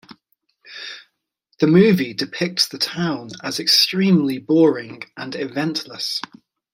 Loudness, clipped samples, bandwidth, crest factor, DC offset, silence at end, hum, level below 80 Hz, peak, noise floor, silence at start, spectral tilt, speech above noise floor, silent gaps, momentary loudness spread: -18 LUFS; under 0.1%; 16 kHz; 18 dB; under 0.1%; 0.55 s; none; -64 dBFS; -2 dBFS; -68 dBFS; 0.1 s; -5 dB/octave; 50 dB; none; 19 LU